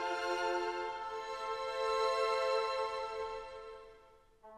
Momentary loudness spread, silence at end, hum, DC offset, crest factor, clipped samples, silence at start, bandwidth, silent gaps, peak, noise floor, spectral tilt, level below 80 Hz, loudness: 14 LU; 0 s; none; under 0.1%; 16 dB; under 0.1%; 0 s; 13.5 kHz; none; -22 dBFS; -63 dBFS; -2 dB/octave; -66 dBFS; -36 LUFS